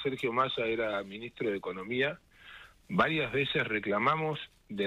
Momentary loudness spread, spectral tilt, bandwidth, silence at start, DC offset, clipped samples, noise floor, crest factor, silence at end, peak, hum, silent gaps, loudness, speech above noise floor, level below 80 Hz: 17 LU; -6.5 dB/octave; 13.5 kHz; 0 s; under 0.1%; under 0.1%; -53 dBFS; 20 dB; 0 s; -12 dBFS; none; none; -31 LUFS; 21 dB; -62 dBFS